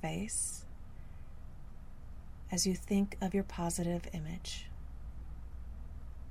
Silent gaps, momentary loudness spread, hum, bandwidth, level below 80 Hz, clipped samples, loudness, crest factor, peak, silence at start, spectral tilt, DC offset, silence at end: none; 20 LU; none; 15.5 kHz; -46 dBFS; under 0.1%; -36 LUFS; 18 dB; -20 dBFS; 0 s; -4.5 dB/octave; under 0.1%; 0 s